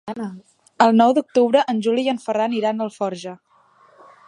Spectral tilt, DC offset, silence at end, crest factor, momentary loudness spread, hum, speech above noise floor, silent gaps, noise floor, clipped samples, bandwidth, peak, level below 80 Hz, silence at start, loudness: -5.5 dB/octave; under 0.1%; 0.95 s; 20 dB; 16 LU; none; 36 dB; none; -55 dBFS; under 0.1%; 10.5 kHz; -2 dBFS; -72 dBFS; 0.05 s; -19 LUFS